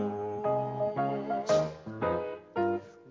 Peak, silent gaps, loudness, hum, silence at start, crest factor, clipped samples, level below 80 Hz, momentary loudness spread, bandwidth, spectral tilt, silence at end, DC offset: -16 dBFS; none; -32 LUFS; none; 0 s; 16 dB; under 0.1%; -60 dBFS; 7 LU; 7.6 kHz; -6.5 dB/octave; 0 s; under 0.1%